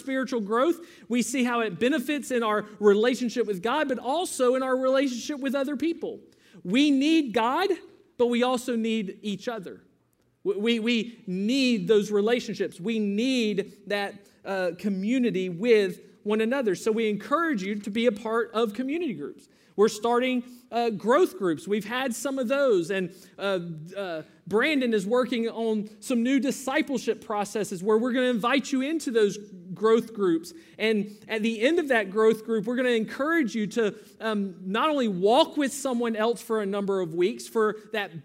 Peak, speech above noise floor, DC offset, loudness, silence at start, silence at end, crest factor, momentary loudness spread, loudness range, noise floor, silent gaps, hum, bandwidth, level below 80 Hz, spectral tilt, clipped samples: -8 dBFS; 42 dB; under 0.1%; -26 LUFS; 0 s; 0.05 s; 18 dB; 9 LU; 2 LU; -68 dBFS; none; none; 16 kHz; -74 dBFS; -4.5 dB/octave; under 0.1%